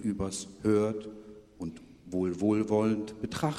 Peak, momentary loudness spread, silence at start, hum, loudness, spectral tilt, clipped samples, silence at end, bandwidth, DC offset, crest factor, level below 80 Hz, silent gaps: -14 dBFS; 15 LU; 0 s; none; -30 LUFS; -6.5 dB/octave; under 0.1%; 0 s; 13.5 kHz; under 0.1%; 16 dB; -58 dBFS; none